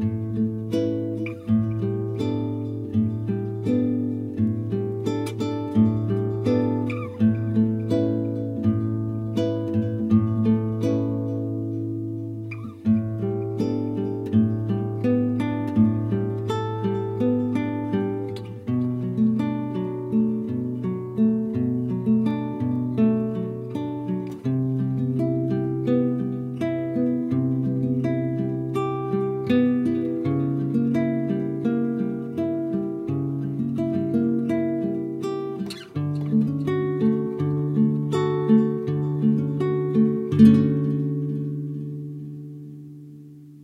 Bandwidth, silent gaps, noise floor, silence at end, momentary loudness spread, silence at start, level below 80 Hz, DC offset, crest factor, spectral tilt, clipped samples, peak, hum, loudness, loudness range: 9 kHz; none; -43 dBFS; 0 s; 7 LU; 0 s; -56 dBFS; under 0.1%; 20 dB; -9.5 dB/octave; under 0.1%; -2 dBFS; none; -24 LUFS; 4 LU